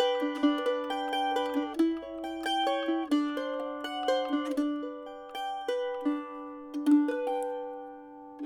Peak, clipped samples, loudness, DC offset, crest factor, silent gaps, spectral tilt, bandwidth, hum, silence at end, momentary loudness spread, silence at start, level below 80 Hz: -14 dBFS; under 0.1%; -31 LUFS; under 0.1%; 16 dB; none; -3 dB/octave; 13.5 kHz; none; 0 s; 13 LU; 0 s; -70 dBFS